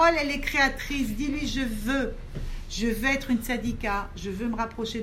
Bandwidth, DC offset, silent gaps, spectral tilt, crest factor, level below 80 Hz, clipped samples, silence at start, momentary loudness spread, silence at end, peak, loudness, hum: 16 kHz; under 0.1%; none; -4.5 dB/octave; 18 dB; -36 dBFS; under 0.1%; 0 s; 11 LU; 0 s; -8 dBFS; -27 LUFS; none